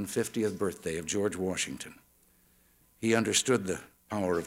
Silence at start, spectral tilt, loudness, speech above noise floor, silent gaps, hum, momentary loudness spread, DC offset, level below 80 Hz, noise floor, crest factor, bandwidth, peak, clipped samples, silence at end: 0 s; -3.5 dB/octave; -31 LUFS; 34 dB; none; none; 12 LU; under 0.1%; -64 dBFS; -65 dBFS; 20 dB; 16.5 kHz; -12 dBFS; under 0.1%; 0 s